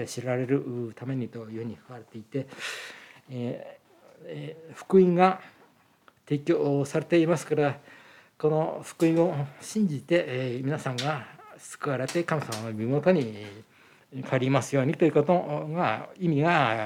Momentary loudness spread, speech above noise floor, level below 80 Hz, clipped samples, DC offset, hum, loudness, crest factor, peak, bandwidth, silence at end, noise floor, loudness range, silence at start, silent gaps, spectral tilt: 18 LU; 34 dB; -78 dBFS; under 0.1%; under 0.1%; none; -27 LUFS; 20 dB; -6 dBFS; 15.5 kHz; 0 s; -61 dBFS; 9 LU; 0 s; none; -6.5 dB/octave